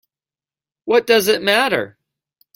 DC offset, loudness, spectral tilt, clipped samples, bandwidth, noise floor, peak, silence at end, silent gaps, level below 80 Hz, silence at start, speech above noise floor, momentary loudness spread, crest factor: under 0.1%; -16 LUFS; -3 dB/octave; under 0.1%; 16.5 kHz; under -90 dBFS; -2 dBFS; 0.65 s; none; -62 dBFS; 0.85 s; over 74 dB; 15 LU; 18 dB